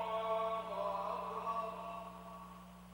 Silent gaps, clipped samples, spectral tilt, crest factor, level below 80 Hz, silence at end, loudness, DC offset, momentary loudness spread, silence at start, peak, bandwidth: none; under 0.1%; -5.5 dB/octave; 14 dB; -66 dBFS; 0 s; -40 LUFS; under 0.1%; 15 LU; 0 s; -28 dBFS; over 20 kHz